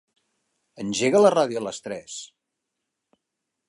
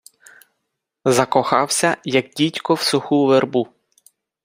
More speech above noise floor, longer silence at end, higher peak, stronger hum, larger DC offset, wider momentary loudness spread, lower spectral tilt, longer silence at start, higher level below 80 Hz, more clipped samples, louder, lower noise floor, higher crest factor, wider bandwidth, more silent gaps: about the same, 60 dB vs 60 dB; first, 1.4 s vs 0.8 s; second, -6 dBFS vs 0 dBFS; neither; neither; first, 18 LU vs 7 LU; about the same, -4 dB/octave vs -4 dB/octave; second, 0.8 s vs 1.05 s; second, -70 dBFS vs -62 dBFS; neither; second, -21 LUFS vs -18 LUFS; first, -82 dBFS vs -77 dBFS; about the same, 20 dB vs 20 dB; second, 11.5 kHz vs 16 kHz; neither